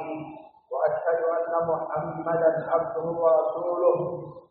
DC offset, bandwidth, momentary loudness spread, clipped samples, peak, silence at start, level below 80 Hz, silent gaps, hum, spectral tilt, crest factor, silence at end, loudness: under 0.1%; 3.8 kHz; 13 LU; under 0.1%; -10 dBFS; 0 s; -68 dBFS; none; none; -7.5 dB/octave; 16 dB; 0.1 s; -26 LUFS